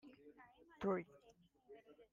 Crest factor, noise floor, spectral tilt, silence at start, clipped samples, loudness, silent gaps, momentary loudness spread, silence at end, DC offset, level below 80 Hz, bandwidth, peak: 20 dB; -72 dBFS; -8 dB/octave; 0.05 s; under 0.1%; -44 LUFS; none; 23 LU; 0.1 s; under 0.1%; -80 dBFS; 7.2 kHz; -28 dBFS